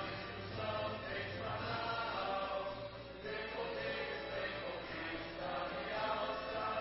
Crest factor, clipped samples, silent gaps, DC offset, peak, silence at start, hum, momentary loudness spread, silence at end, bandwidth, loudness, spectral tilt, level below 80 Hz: 14 dB; under 0.1%; none; under 0.1%; -26 dBFS; 0 s; 60 Hz at -60 dBFS; 5 LU; 0 s; 5.8 kHz; -41 LUFS; -2.5 dB/octave; -62 dBFS